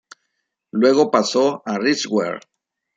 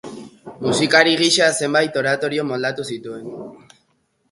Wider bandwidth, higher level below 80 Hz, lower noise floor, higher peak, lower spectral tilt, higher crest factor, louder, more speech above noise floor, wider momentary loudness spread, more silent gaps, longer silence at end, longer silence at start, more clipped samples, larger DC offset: second, 9.2 kHz vs 11.5 kHz; second, -70 dBFS vs -62 dBFS; first, -75 dBFS vs -65 dBFS; about the same, -2 dBFS vs 0 dBFS; about the same, -4 dB/octave vs -3 dB/octave; about the same, 18 dB vs 20 dB; about the same, -18 LUFS vs -17 LUFS; first, 57 dB vs 47 dB; second, 12 LU vs 22 LU; neither; second, 0.6 s vs 0.75 s; first, 0.75 s vs 0.05 s; neither; neither